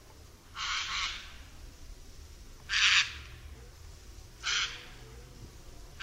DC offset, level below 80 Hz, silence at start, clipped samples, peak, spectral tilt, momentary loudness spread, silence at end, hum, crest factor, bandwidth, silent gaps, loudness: under 0.1%; -50 dBFS; 0 s; under 0.1%; -12 dBFS; 0.5 dB/octave; 27 LU; 0 s; none; 24 dB; 16 kHz; none; -29 LUFS